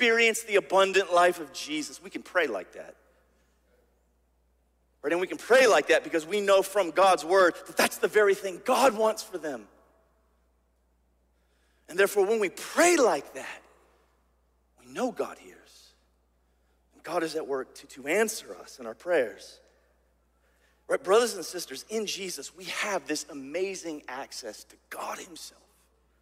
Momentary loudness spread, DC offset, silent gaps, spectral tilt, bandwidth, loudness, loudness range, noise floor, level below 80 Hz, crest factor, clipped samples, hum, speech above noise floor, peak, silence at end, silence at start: 19 LU; under 0.1%; none; -2 dB/octave; 16 kHz; -26 LUFS; 12 LU; -69 dBFS; -70 dBFS; 20 dB; under 0.1%; none; 42 dB; -8 dBFS; 0.7 s; 0 s